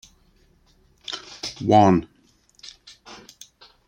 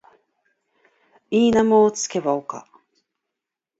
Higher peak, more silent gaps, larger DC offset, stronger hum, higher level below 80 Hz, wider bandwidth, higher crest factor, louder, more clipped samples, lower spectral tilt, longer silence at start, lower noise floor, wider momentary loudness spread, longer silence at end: first, -2 dBFS vs -6 dBFS; neither; neither; neither; about the same, -56 dBFS vs -58 dBFS; first, 16.5 kHz vs 8 kHz; first, 22 dB vs 16 dB; about the same, -21 LUFS vs -19 LUFS; neither; first, -6 dB/octave vs -4.5 dB/octave; second, 1.1 s vs 1.3 s; second, -59 dBFS vs -85 dBFS; first, 27 LU vs 15 LU; second, 0.75 s vs 1.2 s